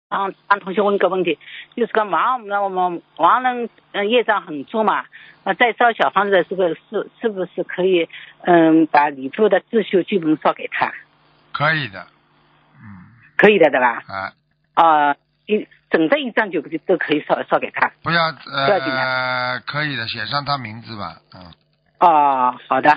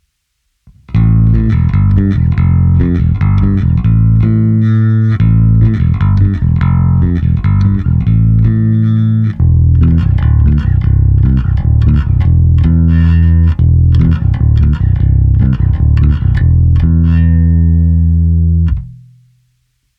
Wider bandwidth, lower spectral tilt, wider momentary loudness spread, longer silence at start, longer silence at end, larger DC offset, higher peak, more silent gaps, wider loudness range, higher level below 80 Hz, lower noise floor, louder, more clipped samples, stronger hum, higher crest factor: first, 5.4 kHz vs 4.1 kHz; second, -3 dB/octave vs -11 dB/octave; first, 13 LU vs 3 LU; second, 0.1 s vs 0.9 s; second, 0 s vs 1.05 s; neither; about the same, 0 dBFS vs 0 dBFS; neither; first, 4 LU vs 1 LU; second, -64 dBFS vs -14 dBFS; second, -56 dBFS vs -65 dBFS; second, -18 LUFS vs -10 LUFS; neither; neither; first, 18 dB vs 8 dB